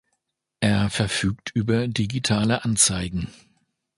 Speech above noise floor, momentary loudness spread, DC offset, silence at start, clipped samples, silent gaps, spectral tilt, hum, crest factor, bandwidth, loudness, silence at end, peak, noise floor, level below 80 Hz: 54 dB; 9 LU; under 0.1%; 0.6 s; under 0.1%; none; -4 dB/octave; none; 20 dB; 11.5 kHz; -22 LUFS; 0.65 s; -4 dBFS; -77 dBFS; -44 dBFS